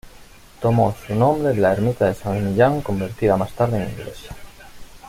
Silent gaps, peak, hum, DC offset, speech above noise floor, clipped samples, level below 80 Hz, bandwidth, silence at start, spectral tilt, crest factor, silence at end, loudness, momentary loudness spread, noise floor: none; -2 dBFS; none; under 0.1%; 25 dB; under 0.1%; -44 dBFS; 16 kHz; 0.05 s; -8 dB/octave; 18 dB; 0 s; -20 LUFS; 16 LU; -44 dBFS